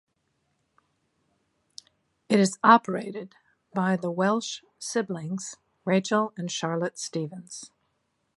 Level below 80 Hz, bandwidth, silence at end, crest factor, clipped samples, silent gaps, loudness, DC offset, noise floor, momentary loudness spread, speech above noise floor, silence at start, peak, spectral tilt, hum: -78 dBFS; 11.5 kHz; 0.7 s; 24 dB; under 0.1%; none; -26 LUFS; under 0.1%; -75 dBFS; 19 LU; 49 dB; 2.3 s; -4 dBFS; -5 dB/octave; none